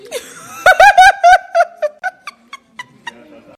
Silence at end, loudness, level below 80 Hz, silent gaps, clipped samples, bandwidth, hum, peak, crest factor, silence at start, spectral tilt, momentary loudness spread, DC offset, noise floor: 0.75 s; -9 LUFS; -44 dBFS; none; 1%; 17.5 kHz; none; 0 dBFS; 12 dB; 0.1 s; -0.5 dB/octave; 25 LU; under 0.1%; -39 dBFS